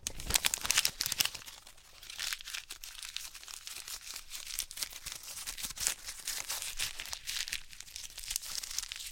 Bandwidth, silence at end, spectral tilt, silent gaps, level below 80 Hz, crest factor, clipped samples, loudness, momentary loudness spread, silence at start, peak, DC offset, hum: 17 kHz; 0 s; 1 dB/octave; none; -54 dBFS; 34 dB; under 0.1%; -36 LUFS; 15 LU; 0 s; -6 dBFS; under 0.1%; none